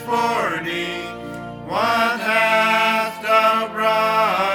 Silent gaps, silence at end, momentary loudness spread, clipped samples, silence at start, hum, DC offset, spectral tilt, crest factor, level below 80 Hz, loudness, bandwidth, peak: none; 0 s; 13 LU; under 0.1%; 0 s; none; under 0.1%; -3.5 dB/octave; 18 dB; -56 dBFS; -18 LUFS; 19 kHz; -2 dBFS